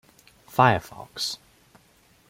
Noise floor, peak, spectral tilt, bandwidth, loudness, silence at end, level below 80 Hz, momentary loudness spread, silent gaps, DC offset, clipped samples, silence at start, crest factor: -59 dBFS; -2 dBFS; -4.5 dB/octave; 16.5 kHz; -24 LUFS; 0.95 s; -58 dBFS; 18 LU; none; under 0.1%; under 0.1%; 0.55 s; 24 dB